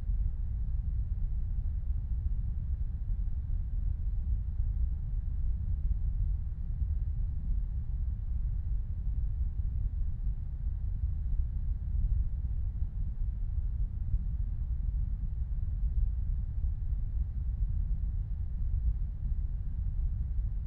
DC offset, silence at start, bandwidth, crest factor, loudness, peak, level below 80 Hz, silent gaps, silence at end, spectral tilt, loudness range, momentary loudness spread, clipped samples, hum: under 0.1%; 0 s; 1.7 kHz; 14 dB; -36 LUFS; -18 dBFS; -32 dBFS; none; 0 s; -11.5 dB/octave; 1 LU; 3 LU; under 0.1%; none